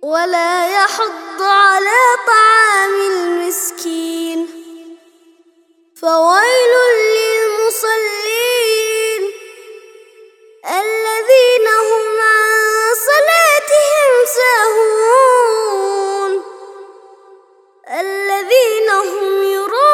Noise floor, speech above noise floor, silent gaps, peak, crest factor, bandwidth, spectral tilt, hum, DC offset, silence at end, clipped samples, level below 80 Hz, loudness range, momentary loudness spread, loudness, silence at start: -53 dBFS; 41 dB; none; 0 dBFS; 14 dB; 18.5 kHz; 1 dB/octave; none; under 0.1%; 0 s; under 0.1%; -74 dBFS; 7 LU; 11 LU; -12 LUFS; 0 s